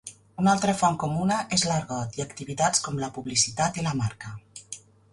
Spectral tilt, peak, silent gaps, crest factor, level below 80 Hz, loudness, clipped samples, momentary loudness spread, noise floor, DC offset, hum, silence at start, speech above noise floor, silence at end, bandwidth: -4 dB/octave; -8 dBFS; none; 20 dB; -56 dBFS; -25 LUFS; under 0.1%; 18 LU; -46 dBFS; under 0.1%; none; 0.05 s; 20 dB; 0.35 s; 11.5 kHz